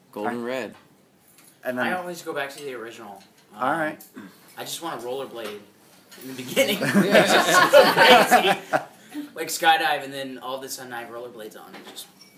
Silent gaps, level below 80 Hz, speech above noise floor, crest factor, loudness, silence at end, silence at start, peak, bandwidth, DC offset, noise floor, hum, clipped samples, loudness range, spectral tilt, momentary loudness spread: none; -68 dBFS; 34 dB; 22 dB; -20 LUFS; 0.35 s; 0.15 s; -2 dBFS; 16 kHz; under 0.1%; -57 dBFS; none; under 0.1%; 14 LU; -3 dB/octave; 24 LU